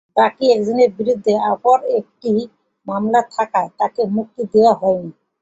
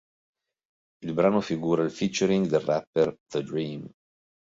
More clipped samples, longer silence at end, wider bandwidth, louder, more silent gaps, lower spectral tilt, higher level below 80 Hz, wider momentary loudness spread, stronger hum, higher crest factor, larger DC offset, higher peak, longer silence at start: neither; second, 0.3 s vs 0.7 s; about the same, 8 kHz vs 7.8 kHz; first, -17 LUFS vs -26 LUFS; second, none vs 2.87-2.93 s, 3.20-3.26 s; about the same, -6.5 dB/octave vs -6 dB/octave; about the same, -62 dBFS vs -64 dBFS; about the same, 9 LU vs 11 LU; neither; about the same, 16 dB vs 18 dB; neither; first, -2 dBFS vs -10 dBFS; second, 0.15 s vs 1 s